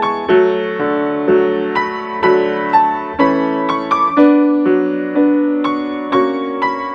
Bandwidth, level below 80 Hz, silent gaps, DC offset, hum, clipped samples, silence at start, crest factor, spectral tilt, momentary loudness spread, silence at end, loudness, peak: 6.4 kHz; -52 dBFS; none; under 0.1%; none; under 0.1%; 0 s; 14 dB; -7 dB/octave; 7 LU; 0 s; -15 LUFS; 0 dBFS